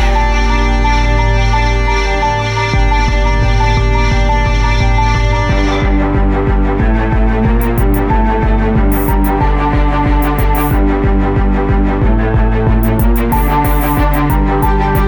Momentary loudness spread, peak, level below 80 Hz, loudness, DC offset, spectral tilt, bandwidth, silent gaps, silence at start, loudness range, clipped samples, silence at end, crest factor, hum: 1 LU; -2 dBFS; -14 dBFS; -13 LUFS; under 0.1%; -6.5 dB/octave; 19.5 kHz; none; 0 s; 0 LU; under 0.1%; 0 s; 10 dB; none